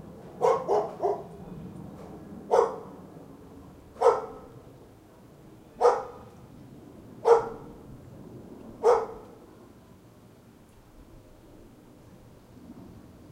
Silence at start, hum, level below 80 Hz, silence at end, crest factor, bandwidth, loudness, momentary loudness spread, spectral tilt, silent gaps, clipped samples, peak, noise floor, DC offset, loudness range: 0.05 s; none; -60 dBFS; 0.35 s; 26 dB; 12.5 kHz; -26 LUFS; 25 LU; -6 dB/octave; none; under 0.1%; -6 dBFS; -54 dBFS; under 0.1%; 4 LU